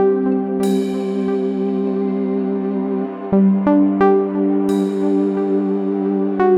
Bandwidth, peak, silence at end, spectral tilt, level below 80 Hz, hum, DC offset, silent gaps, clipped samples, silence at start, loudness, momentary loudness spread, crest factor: 12 kHz; -4 dBFS; 0 s; -8.5 dB/octave; -56 dBFS; none; under 0.1%; none; under 0.1%; 0 s; -18 LUFS; 6 LU; 14 dB